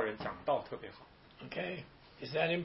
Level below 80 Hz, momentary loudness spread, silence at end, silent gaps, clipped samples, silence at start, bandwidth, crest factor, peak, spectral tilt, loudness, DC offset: -66 dBFS; 20 LU; 0 s; none; under 0.1%; 0 s; 5.8 kHz; 20 dB; -18 dBFS; -3.5 dB/octave; -39 LUFS; under 0.1%